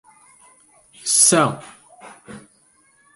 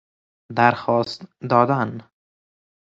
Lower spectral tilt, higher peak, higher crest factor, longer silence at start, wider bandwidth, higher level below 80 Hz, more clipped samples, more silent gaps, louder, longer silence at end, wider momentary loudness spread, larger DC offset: second, -2.5 dB/octave vs -7 dB/octave; about the same, -2 dBFS vs 0 dBFS; about the same, 22 dB vs 22 dB; first, 1.05 s vs 0.5 s; first, 12 kHz vs 8 kHz; about the same, -66 dBFS vs -62 dBFS; neither; neither; first, -15 LUFS vs -20 LUFS; about the same, 0.75 s vs 0.85 s; first, 23 LU vs 13 LU; neither